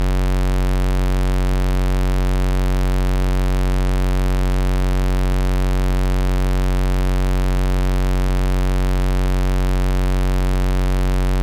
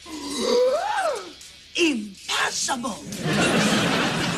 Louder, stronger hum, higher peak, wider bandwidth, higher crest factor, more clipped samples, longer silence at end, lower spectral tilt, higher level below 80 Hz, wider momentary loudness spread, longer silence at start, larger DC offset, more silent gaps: first, -20 LUFS vs -23 LUFS; neither; about the same, -12 dBFS vs -10 dBFS; first, 15 kHz vs 13.5 kHz; second, 6 dB vs 14 dB; neither; about the same, 0 s vs 0 s; first, -6.5 dB/octave vs -3.5 dB/octave; first, -18 dBFS vs -54 dBFS; second, 0 LU vs 11 LU; about the same, 0 s vs 0 s; neither; neither